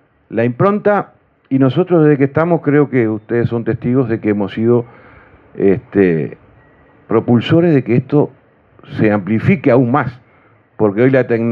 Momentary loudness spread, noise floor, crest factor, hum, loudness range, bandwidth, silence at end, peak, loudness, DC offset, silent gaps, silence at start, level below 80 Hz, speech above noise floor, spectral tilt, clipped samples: 7 LU; -50 dBFS; 14 dB; none; 3 LU; 5.4 kHz; 0 s; 0 dBFS; -14 LUFS; under 0.1%; none; 0.3 s; -52 dBFS; 37 dB; -10.5 dB/octave; under 0.1%